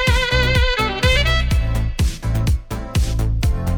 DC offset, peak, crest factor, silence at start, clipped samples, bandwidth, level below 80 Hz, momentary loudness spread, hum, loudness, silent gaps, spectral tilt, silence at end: under 0.1%; -2 dBFS; 14 dB; 0 s; under 0.1%; 18 kHz; -20 dBFS; 6 LU; none; -19 LUFS; none; -5 dB/octave; 0 s